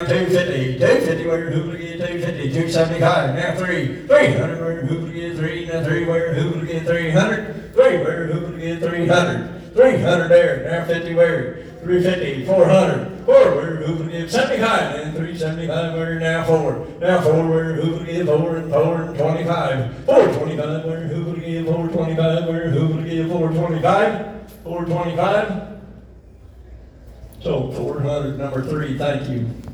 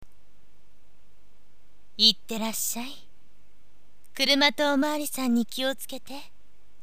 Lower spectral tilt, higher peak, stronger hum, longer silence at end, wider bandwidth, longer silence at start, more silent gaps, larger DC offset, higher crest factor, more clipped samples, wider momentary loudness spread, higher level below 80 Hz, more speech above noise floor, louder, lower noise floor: first, -6.5 dB/octave vs -1.5 dB/octave; first, 0 dBFS vs -4 dBFS; neither; second, 0 s vs 0.55 s; second, 13.5 kHz vs 15.5 kHz; second, 0 s vs 2 s; neither; second, under 0.1% vs 2%; second, 18 dB vs 26 dB; neither; second, 10 LU vs 21 LU; first, -46 dBFS vs -66 dBFS; second, 24 dB vs 38 dB; first, -19 LUFS vs -24 LUFS; second, -42 dBFS vs -64 dBFS